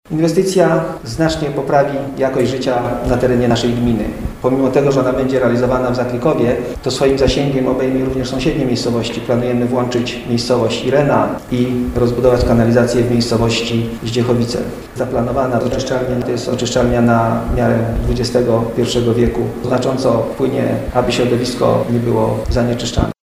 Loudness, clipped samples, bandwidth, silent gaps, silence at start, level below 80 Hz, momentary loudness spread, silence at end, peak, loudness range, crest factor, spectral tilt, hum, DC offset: -15 LUFS; under 0.1%; 16 kHz; none; 0.1 s; -30 dBFS; 6 LU; 0.15 s; 0 dBFS; 2 LU; 14 dB; -6 dB/octave; none; under 0.1%